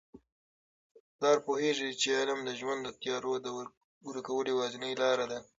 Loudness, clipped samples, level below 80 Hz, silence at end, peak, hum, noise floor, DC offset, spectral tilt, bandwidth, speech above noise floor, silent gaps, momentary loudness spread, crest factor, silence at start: -33 LUFS; under 0.1%; -76 dBFS; 0.15 s; -16 dBFS; none; under -90 dBFS; under 0.1%; -2.5 dB/octave; 7.8 kHz; over 57 dB; 0.32-1.19 s, 3.77-4.01 s; 13 LU; 18 dB; 0.15 s